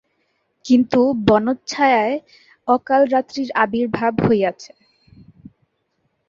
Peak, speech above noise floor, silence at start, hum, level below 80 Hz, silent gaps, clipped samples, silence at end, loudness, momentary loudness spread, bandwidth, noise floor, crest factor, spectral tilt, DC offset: -2 dBFS; 52 dB; 0.65 s; none; -52 dBFS; none; under 0.1%; 1.6 s; -18 LUFS; 8 LU; 7.4 kHz; -69 dBFS; 18 dB; -6 dB/octave; under 0.1%